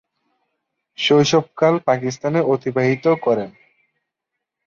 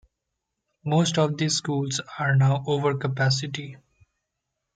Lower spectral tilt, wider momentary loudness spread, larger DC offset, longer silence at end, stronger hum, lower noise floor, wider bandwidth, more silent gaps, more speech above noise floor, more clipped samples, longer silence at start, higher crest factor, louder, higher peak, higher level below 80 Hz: about the same, -5.5 dB/octave vs -5 dB/octave; second, 6 LU vs 11 LU; neither; first, 1.2 s vs 1 s; neither; about the same, -81 dBFS vs -82 dBFS; second, 7.4 kHz vs 9.4 kHz; neither; first, 64 dB vs 58 dB; neither; first, 1 s vs 0.85 s; about the same, 16 dB vs 16 dB; first, -18 LUFS vs -24 LUFS; first, -4 dBFS vs -10 dBFS; about the same, -62 dBFS vs -62 dBFS